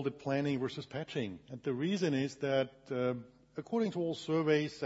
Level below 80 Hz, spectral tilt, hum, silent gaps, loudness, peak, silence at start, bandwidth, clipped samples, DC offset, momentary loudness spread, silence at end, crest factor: -74 dBFS; -5.5 dB/octave; none; none; -35 LUFS; -18 dBFS; 0 s; 7.6 kHz; under 0.1%; under 0.1%; 10 LU; 0 s; 18 dB